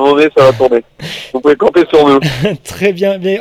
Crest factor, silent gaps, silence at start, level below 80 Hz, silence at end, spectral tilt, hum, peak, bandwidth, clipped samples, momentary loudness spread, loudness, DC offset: 10 dB; none; 0 s; -44 dBFS; 0 s; -6 dB/octave; none; 0 dBFS; 15 kHz; 1%; 9 LU; -10 LUFS; under 0.1%